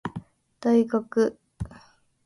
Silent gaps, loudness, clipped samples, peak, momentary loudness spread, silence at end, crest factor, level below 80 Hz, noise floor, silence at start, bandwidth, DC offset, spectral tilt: none; -24 LUFS; under 0.1%; -10 dBFS; 17 LU; 0.5 s; 16 dB; -52 dBFS; -55 dBFS; 0.05 s; 11.5 kHz; under 0.1%; -7.5 dB/octave